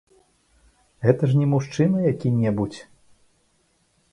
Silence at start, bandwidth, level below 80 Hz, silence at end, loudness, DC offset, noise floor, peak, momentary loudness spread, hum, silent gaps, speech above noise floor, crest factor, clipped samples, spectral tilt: 1 s; 10.5 kHz; -56 dBFS; 1.3 s; -22 LUFS; under 0.1%; -65 dBFS; -2 dBFS; 8 LU; none; none; 45 dB; 22 dB; under 0.1%; -8.5 dB/octave